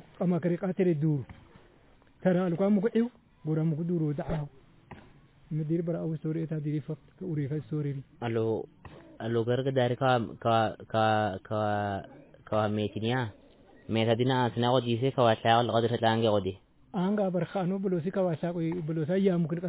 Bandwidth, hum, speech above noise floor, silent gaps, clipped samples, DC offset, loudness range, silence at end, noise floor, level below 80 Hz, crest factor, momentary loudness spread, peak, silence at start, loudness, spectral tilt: 4 kHz; none; 31 dB; none; under 0.1%; under 0.1%; 7 LU; 0 s; -60 dBFS; -60 dBFS; 18 dB; 10 LU; -10 dBFS; 0.2 s; -29 LUFS; -6 dB/octave